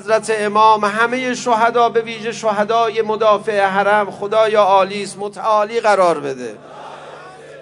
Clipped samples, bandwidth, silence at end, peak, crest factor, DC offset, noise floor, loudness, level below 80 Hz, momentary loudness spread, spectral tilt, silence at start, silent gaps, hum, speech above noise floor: under 0.1%; 11 kHz; 0 s; 0 dBFS; 16 dB; under 0.1%; -36 dBFS; -16 LUFS; -64 dBFS; 18 LU; -4 dB/octave; 0 s; none; none; 21 dB